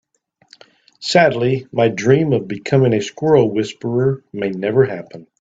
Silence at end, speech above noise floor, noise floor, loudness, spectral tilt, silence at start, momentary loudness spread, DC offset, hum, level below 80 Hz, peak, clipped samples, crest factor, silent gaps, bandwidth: 0.2 s; 44 dB; -60 dBFS; -17 LUFS; -6.5 dB/octave; 1 s; 9 LU; under 0.1%; none; -56 dBFS; 0 dBFS; under 0.1%; 16 dB; none; 8 kHz